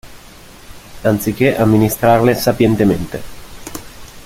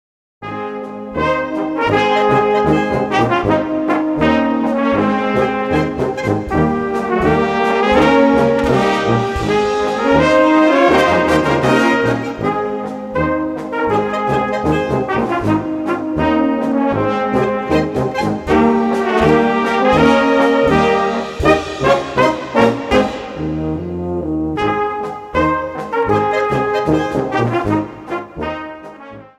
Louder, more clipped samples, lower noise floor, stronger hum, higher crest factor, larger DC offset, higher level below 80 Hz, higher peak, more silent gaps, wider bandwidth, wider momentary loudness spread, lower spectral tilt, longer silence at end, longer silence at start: about the same, -14 LUFS vs -15 LUFS; neither; first, -39 dBFS vs -35 dBFS; neither; about the same, 14 dB vs 16 dB; neither; about the same, -38 dBFS vs -36 dBFS; about the same, -2 dBFS vs 0 dBFS; neither; first, 16.5 kHz vs 13.5 kHz; first, 19 LU vs 10 LU; about the same, -6 dB/octave vs -6.5 dB/octave; about the same, 0.05 s vs 0.15 s; second, 0.05 s vs 0.4 s